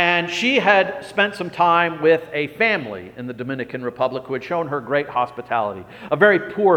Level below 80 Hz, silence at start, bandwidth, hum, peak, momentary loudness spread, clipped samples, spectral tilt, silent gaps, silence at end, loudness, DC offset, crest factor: -62 dBFS; 0 s; 16 kHz; none; 0 dBFS; 12 LU; under 0.1%; -5 dB/octave; none; 0 s; -19 LUFS; under 0.1%; 18 dB